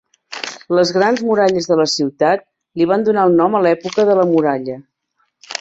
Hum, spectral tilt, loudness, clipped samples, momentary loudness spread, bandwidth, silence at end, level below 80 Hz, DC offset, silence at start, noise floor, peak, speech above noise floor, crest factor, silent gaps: none; -5 dB/octave; -15 LUFS; under 0.1%; 14 LU; 8 kHz; 0.05 s; -60 dBFS; under 0.1%; 0.3 s; -66 dBFS; -2 dBFS; 52 dB; 14 dB; none